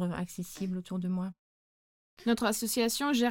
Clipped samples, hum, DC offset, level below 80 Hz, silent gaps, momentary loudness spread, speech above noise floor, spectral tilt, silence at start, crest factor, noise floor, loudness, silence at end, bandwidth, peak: under 0.1%; none; under 0.1%; -64 dBFS; 1.39-2.17 s; 9 LU; over 59 dB; -4.5 dB/octave; 0 s; 18 dB; under -90 dBFS; -32 LUFS; 0 s; 17 kHz; -14 dBFS